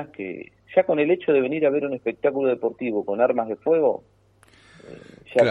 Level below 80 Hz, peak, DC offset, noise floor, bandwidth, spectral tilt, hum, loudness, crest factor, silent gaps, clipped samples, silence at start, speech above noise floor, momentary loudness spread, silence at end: -68 dBFS; -4 dBFS; under 0.1%; -56 dBFS; 8.6 kHz; -7.5 dB/octave; none; -23 LUFS; 20 dB; none; under 0.1%; 0 s; 34 dB; 13 LU; 0 s